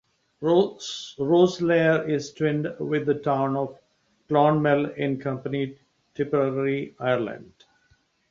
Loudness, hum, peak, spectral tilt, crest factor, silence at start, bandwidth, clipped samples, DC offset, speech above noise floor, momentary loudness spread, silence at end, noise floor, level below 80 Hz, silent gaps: -24 LUFS; none; -6 dBFS; -6.5 dB/octave; 18 dB; 0.4 s; 7.6 kHz; under 0.1%; under 0.1%; 41 dB; 12 LU; 0.85 s; -65 dBFS; -64 dBFS; none